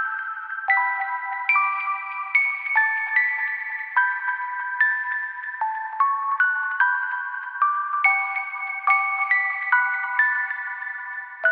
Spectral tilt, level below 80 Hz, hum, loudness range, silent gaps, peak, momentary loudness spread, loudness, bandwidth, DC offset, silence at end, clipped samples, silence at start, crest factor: 1 dB/octave; under -90 dBFS; none; 2 LU; none; -6 dBFS; 8 LU; -22 LUFS; 5.2 kHz; under 0.1%; 0 s; under 0.1%; 0 s; 18 dB